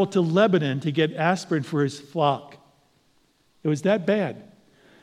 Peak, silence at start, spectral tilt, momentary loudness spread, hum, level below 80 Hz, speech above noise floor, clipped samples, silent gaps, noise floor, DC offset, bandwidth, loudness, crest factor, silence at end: -6 dBFS; 0 s; -6.5 dB/octave; 10 LU; none; -74 dBFS; 41 dB; under 0.1%; none; -64 dBFS; under 0.1%; 11.5 kHz; -24 LUFS; 18 dB; 0.6 s